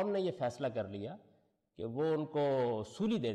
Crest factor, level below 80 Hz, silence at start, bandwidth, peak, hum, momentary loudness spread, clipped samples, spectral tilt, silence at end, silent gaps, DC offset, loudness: 10 dB; -72 dBFS; 0 s; 10.5 kHz; -26 dBFS; none; 12 LU; under 0.1%; -7 dB/octave; 0 s; none; under 0.1%; -36 LUFS